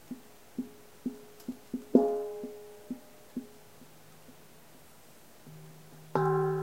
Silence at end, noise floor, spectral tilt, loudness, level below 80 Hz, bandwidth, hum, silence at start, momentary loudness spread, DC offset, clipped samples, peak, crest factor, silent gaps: 0 s; -57 dBFS; -7.5 dB/octave; -34 LUFS; -72 dBFS; 16 kHz; none; 0.1 s; 28 LU; 0.1%; under 0.1%; -6 dBFS; 30 dB; none